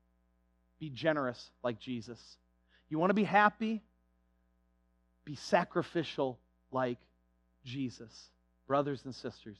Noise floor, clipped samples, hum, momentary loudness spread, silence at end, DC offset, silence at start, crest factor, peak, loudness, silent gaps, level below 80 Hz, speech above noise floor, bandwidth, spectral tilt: -73 dBFS; under 0.1%; none; 20 LU; 0.05 s; under 0.1%; 0.8 s; 24 dB; -12 dBFS; -34 LUFS; none; -72 dBFS; 39 dB; 11 kHz; -6 dB/octave